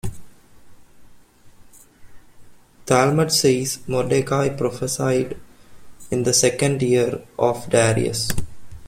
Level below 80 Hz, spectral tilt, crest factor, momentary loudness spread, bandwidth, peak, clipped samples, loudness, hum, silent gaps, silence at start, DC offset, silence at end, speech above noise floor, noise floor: -46 dBFS; -4.5 dB/octave; 20 dB; 11 LU; 16.5 kHz; -2 dBFS; under 0.1%; -20 LUFS; none; none; 0.05 s; under 0.1%; 0 s; 28 dB; -47 dBFS